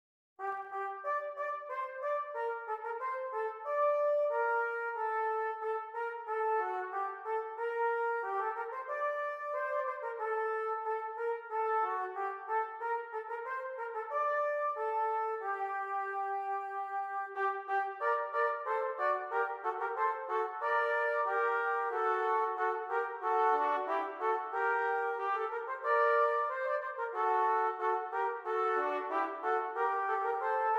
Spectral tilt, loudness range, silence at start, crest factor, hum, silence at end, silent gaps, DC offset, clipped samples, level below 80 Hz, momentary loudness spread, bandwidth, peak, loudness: -2.5 dB/octave; 4 LU; 0.4 s; 16 dB; none; 0 s; none; under 0.1%; under 0.1%; under -90 dBFS; 7 LU; 7.8 kHz; -18 dBFS; -34 LUFS